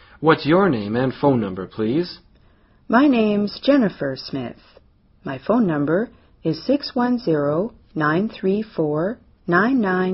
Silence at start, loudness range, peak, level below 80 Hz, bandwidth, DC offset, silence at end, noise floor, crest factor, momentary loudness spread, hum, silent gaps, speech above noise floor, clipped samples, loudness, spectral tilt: 0.2 s; 3 LU; -2 dBFS; -54 dBFS; 6 kHz; under 0.1%; 0 s; -54 dBFS; 20 dB; 12 LU; none; none; 35 dB; under 0.1%; -20 LUFS; -5.5 dB/octave